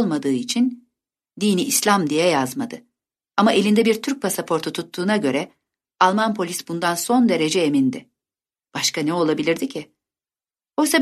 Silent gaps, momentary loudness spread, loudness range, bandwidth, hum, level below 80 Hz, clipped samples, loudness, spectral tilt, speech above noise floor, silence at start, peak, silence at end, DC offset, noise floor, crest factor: none; 11 LU; 2 LU; 13.5 kHz; none; -68 dBFS; under 0.1%; -20 LUFS; -4 dB/octave; over 70 dB; 0 s; -2 dBFS; 0 s; under 0.1%; under -90 dBFS; 20 dB